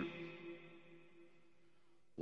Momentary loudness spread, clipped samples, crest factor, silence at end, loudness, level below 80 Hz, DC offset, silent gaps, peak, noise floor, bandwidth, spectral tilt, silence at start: 17 LU; under 0.1%; 22 dB; 0 s; -54 LUFS; -86 dBFS; under 0.1%; none; -30 dBFS; -76 dBFS; 7.8 kHz; -7 dB/octave; 0 s